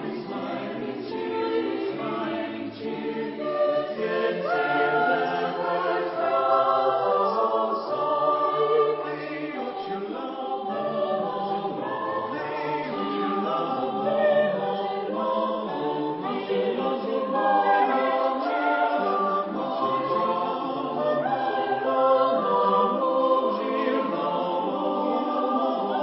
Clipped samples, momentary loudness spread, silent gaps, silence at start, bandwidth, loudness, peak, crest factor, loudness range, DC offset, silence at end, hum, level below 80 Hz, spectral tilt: under 0.1%; 9 LU; none; 0 s; 5.8 kHz; -25 LUFS; -10 dBFS; 16 dB; 5 LU; under 0.1%; 0 s; none; -72 dBFS; -9.5 dB/octave